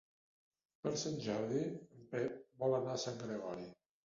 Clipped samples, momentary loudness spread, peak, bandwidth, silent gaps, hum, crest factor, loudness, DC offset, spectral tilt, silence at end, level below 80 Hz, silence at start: under 0.1%; 9 LU; -24 dBFS; 7.4 kHz; none; none; 18 dB; -41 LUFS; under 0.1%; -5.5 dB/octave; 0.3 s; -76 dBFS; 0.85 s